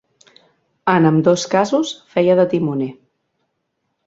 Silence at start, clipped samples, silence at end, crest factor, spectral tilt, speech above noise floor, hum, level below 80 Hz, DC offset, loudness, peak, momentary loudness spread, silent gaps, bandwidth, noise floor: 0.85 s; under 0.1%; 1.15 s; 18 dB; -6 dB/octave; 57 dB; none; -60 dBFS; under 0.1%; -17 LUFS; 0 dBFS; 9 LU; none; 8 kHz; -72 dBFS